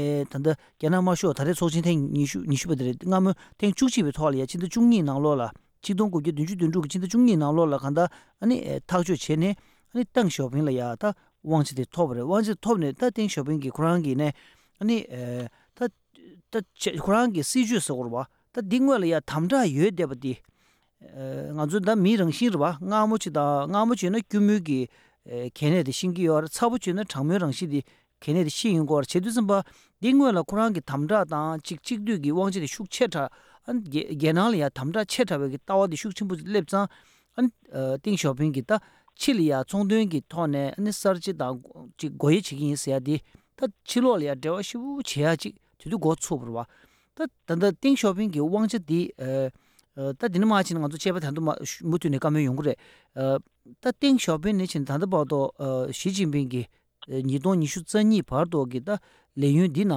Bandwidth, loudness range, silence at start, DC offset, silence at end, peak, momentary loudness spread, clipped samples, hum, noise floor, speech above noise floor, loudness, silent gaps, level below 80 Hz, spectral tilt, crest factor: 16 kHz; 3 LU; 0 s; under 0.1%; 0 s; -10 dBFS; 10 LU; under 0.1%; none; -66 dBFS; 41 dB; -25 LUFS; none; -60 dBFS; -6 dB/octave; 16 dB